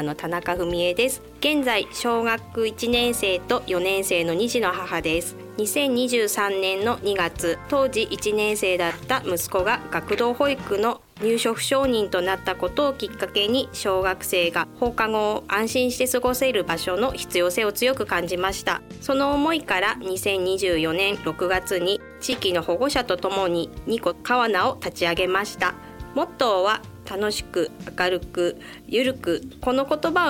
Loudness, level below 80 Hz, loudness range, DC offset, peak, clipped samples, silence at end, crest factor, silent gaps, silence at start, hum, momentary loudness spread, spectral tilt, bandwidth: -23 LUFS; -48 dBFS; 2 LU; under 0.1%; -8 dBFS; under 0.1%; 0 s; 16 dB; none; 0 s; none; 5 LU; -3 dB/octave; 17.5 kHz